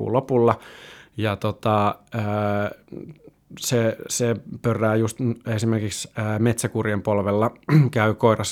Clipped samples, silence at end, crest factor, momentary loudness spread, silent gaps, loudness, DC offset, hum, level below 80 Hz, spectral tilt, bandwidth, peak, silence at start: under 0.1%; 0 s; 20 dB; 10 LU; none; -23 LUFS; under 0.1%; none; -58 dBFS; -6 dB/octave; 16.5 kHz; -2 dBFS; 0 s